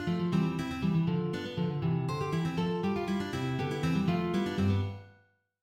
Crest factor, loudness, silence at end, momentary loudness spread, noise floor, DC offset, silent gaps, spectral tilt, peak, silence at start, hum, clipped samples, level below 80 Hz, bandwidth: 14 dB; -31 LUFS; 0.5 s; 4 LU; -66 dBFS; under 0.1%; none; -7.5 dB/octave; -18 dBFS; 0 s; none; under 0.1%; -56 dBFS; 12.5 kHz